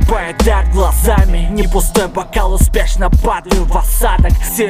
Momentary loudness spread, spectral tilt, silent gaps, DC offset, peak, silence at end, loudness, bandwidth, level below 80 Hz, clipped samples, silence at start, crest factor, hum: 3 LU; -5 dB/octave; none; under 0.1%; 0 dBFS; 0 s; -14 LUFS; 16 kHz; -12 dBFS; under 0.1%; 0 s; 10 dB; none